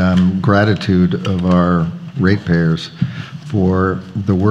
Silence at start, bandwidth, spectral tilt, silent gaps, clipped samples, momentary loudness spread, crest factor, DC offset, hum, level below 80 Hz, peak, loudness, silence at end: 0 s; 7.8 kHz; -8 dB/octave; none; under 0.1%; 9 LU; 14 dB; under 0.1%; none; -42 dBFS; 0 dBFS; -16 LUFS; 0 s